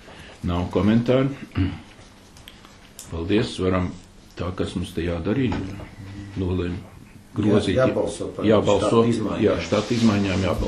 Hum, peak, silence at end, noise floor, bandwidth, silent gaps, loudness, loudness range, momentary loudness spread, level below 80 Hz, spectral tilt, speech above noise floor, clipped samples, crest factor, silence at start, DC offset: none; -4 dBFS; 0 s; -47 dBFS; 13 kHz; none; -23 LUFS; 7 LU; 17 LU; -42 dBFS; -6.5 dB/octave; 25 dB; under 0.1%; 18 dB; 0 s; under 0.1%